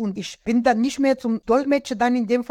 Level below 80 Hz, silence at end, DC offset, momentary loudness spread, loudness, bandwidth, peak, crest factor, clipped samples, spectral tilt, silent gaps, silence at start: -54 dBFS; 0.05 s; under 0.1%; 4 LU; -21 LUFS; 12.5 kHz; -6 dBFS; 14 dB; under 0.1%; -5 dB/octave; none; 0 s